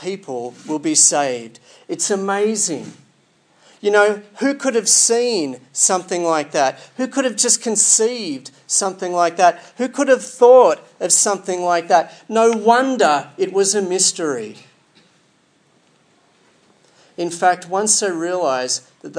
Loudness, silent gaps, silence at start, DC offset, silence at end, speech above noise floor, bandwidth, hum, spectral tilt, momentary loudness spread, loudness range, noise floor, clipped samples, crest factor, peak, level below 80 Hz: -16 LUFS; none; 0 s; under 0.1%; 0 s; 41 dB; 10.5 kHz; none; -2 dB/octave; 14 LU; 7 LU; -58 dBFS; under 0.1%; 18 dB; 0 dBFS; -82 dBFS